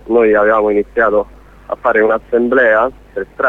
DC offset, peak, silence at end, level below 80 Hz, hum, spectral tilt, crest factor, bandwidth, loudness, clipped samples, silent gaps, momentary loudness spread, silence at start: under 0.1%; 0 dBFS; 0 s; -42 dBFS; none; -7.5 dB/octave; 12 dB; 4 kHz; -13 LUFS; under 0.1%; none; 15 LU; 0.05 s